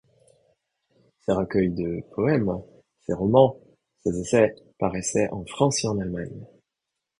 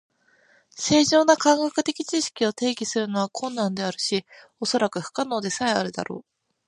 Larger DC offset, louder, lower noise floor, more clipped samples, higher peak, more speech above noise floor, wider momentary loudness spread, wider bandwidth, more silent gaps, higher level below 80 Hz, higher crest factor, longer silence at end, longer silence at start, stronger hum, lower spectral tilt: neither; about the same, -24 LUFS vs -23 LUFS; first, -84 dBFS vs -60 dBFS; neither; about the same, -4 dBFS vs -2 dBFS; first, 61 dB vs 37 dB; about the same, 13 LU vs 12 LU; about the same, 11 kHz vs 11.5 kHz; neither; first, -52 dBFS vs -64 dBFS; about the same, 22 dB vs 22 dB; first, 0.75 s vs 0.45 s; first, 1.3 s vs 0.75 s; neither; first, -5.5 dB/octave vs -3.5 dB/octave